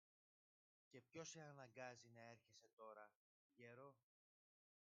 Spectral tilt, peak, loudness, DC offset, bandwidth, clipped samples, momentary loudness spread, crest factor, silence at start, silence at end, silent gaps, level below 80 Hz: -3.5 dB/octave; -42 dBFS; -62 LUFS; under 0.1%; 7.2 kHz; under 0.1%; 9 LU; 24 dB; 0.9 s; 1 s; 2.73-2.77 s, 3.15-3.50 s; under -90 dBFS